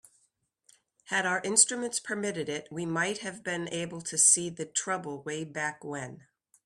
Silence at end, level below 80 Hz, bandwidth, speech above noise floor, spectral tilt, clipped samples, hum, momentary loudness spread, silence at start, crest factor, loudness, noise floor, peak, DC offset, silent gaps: 0.5 s; -74 dBFS; 15 kHz; 44 dB; -2 dB/octave; under 0.1%; none; 15 LU; 1.05 s; 26 dB; -28 LUFS; -74 dBFS; -6 dBFS; under 0.1%; none